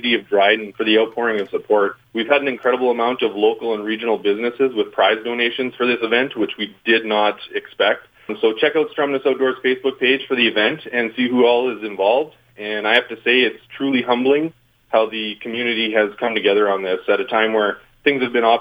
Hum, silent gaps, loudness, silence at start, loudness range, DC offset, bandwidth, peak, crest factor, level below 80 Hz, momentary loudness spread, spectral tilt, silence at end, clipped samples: none; none; -18 LUFS; 0 s; 2 LU; under 0.1%; 5 kHz; 0 dBFS; 18 dB; -66 dBFS; 7 LU; -6 dB/octave; 0 s; under 0.1%